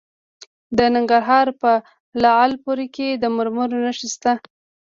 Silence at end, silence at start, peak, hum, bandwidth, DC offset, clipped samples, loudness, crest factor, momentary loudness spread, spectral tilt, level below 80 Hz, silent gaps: 0.55 s; 0.7 s; -2 dBFS; none; 7.6 kHz; under 0.1%; under 0.1%; -19 LUFS; 16 dB; 9 LU; -4 dB/octave; -54 dBFS; 2.00-2.12 s